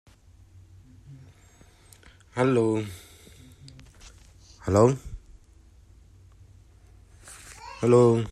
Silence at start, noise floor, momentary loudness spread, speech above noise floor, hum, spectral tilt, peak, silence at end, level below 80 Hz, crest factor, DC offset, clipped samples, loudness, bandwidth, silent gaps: 1.1 s; -55 dBFS; 27 LU; 34 dB; none; -7.5 dB/octave; -6 dBFS; 0 s; -52 dBFS; 22 dB; under 0.1%; under 0.1%; -23 LUFS; 13.5 kHz; none